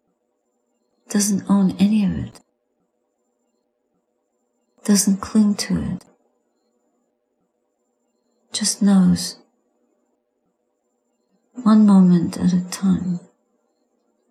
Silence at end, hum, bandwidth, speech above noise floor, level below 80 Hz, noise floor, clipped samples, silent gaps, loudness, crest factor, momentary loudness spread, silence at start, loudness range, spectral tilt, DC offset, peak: 1.1 s; none; 15 kHz; 54 dB; -52 dBFS; -71 dBFS; under 0.1%; none; -18 LUFS; 16 dB; 15 LU; 1.1 s; 7 LU; -5.5 dB/octave; under 0.1%; -4 dBFS